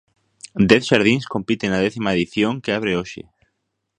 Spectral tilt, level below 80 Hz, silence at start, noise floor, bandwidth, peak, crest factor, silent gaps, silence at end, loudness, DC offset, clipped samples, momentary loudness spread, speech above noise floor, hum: -5.5 dB/octave; -50 dBFS; 0.45 s; -74 dBFS; 10.5 kHz; 0 dBFS; 20 dB; none; 0.75 s; -19 LUFS; under 0.1%; under 0.1%; 11 LU; 55 dB; none